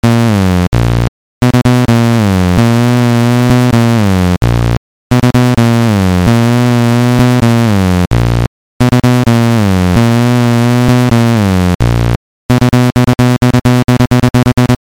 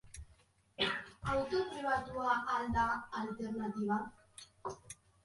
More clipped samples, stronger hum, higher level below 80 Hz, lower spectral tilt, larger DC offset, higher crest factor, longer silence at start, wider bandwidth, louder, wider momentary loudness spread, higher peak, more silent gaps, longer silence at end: neither; neither; first, -24 dBFS vs -58 dBFS; first, -7 dB/octave vs -4.5 dB/octave; first, 0.5% vs under 0.1%; second, 8 dB vs 18 dB; about the same, 0.05 s vs 0.05 s; first, 16.5 kHz vs 11.5 kHz; first, -10 LUFS vs -37 LUFS; second, 4 LU vs 20 LU; first, 0 dBFS vs -20 dBFS; first, 0.67-0.72 s, 1.08-1.41 s, 4.77-5.10 s, 8.47-8.80 s, 11.75-11.79 s, 12.16-12.49 s vs none; second, 0.05 s vs 0.3 s